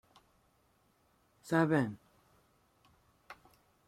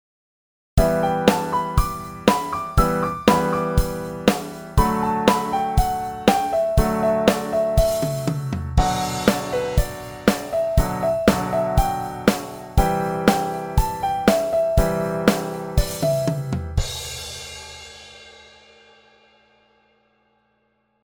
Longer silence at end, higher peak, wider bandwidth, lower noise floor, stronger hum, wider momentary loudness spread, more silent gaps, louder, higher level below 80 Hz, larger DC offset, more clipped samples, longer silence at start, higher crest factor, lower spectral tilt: second, 0.55 s vs 2.75 s; second, -14 dBFS vs 0 dBFS; second, 15.5 kHz vs over 20 kHz; first, -72 dBFS vs -67 dBFS; neither; first, 26 LU vs 9 LU; neither; second, -32 LUFS vs -21 LUFS; second, -74 dBFS vs -30 dBFS; neither; neither; first, 1.45 s vs 0.75 s; about the same, 24 dB vs 20 dB; first, -7.5 dB/octave vs -5.5 dB/octave